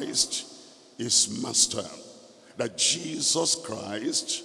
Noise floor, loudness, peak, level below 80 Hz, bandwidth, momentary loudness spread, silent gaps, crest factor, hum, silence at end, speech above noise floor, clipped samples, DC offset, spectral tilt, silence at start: -51 dBFS; -25 LUFS; -6 dBFS; -68 dBFS; 12 kHz; 13 LU; none; 22 dB; none; 0 s; 23 dB; under 0.1%; under 0.1%; -1 dB/octave; 0 s